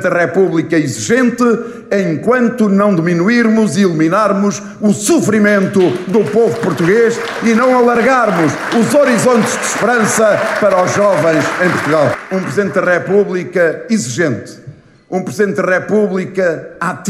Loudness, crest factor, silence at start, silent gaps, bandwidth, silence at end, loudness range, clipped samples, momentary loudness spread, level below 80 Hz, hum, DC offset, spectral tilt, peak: -12 LUFS; 12 dB; 0 s; none; 15 kHz; 0 s; 4 LU; under 0.1%; 6 LU; -54 dBFS; none; under 0.1%; -5.5 dB/octave; 0 dBFS